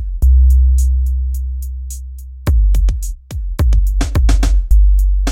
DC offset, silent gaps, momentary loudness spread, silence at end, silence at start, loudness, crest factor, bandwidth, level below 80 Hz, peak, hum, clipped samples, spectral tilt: under 0.1%; none; 14 LU; 0 s; 0 s; -15 LUFS; 12 dB; 14.5 kHz; -12 dBFS; 0 dBFS; none; under 0.1%; -6 dB/octave